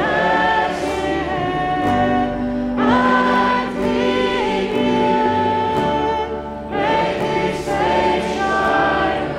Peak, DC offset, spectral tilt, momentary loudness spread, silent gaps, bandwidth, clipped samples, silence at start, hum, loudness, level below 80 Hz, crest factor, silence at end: -4 dBFS; under 0.1%; -5.5 dB/octave; 5 LU; none; 12.5 kHz; under 0.1%; 0 s; none; -18 LUFS; -38 dBFS; 14 dB; 0 s